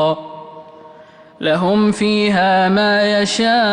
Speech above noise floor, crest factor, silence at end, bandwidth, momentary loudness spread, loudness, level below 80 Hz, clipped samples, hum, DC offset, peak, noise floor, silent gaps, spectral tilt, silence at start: 28 dB; 10 dB; 0 s; 10.5 kHz; 11 LU; -15 LUFS; -54 dBFS; under 0.1%; none; under 0.1%; -6 dBFS; -42 dBFS; none; -5 dB/octave; 0 s